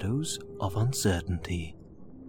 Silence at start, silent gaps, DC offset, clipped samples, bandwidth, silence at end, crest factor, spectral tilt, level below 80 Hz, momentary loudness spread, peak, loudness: 0 s; none; under 0.1%; under 0.1%; 18 kHz; 0 s; 18 dB; -5 dB/octave; -46 dBFS; 18 LU; -12 dBFS; -31 LUFS